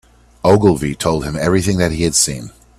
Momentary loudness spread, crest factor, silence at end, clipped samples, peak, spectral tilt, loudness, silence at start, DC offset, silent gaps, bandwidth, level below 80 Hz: 6 LU; 16 dB; 0.3 s; under 0.1%; 0 dBFS; -4.5 dB/octave; -15 LUFS; 0.45 s; under 0.1%; none; 15.5 kHz; -36 dBFS